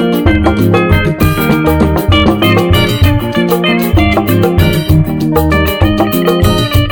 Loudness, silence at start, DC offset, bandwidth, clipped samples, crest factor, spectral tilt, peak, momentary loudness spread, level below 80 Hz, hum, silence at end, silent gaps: -10 LUFS; 0 s; under 0.1%; 20 kHz; 0.6%; 10 dB; -6.5 dB/octave; 0 dBFS; 2 LU; -20 dBFS; none; 0 s; none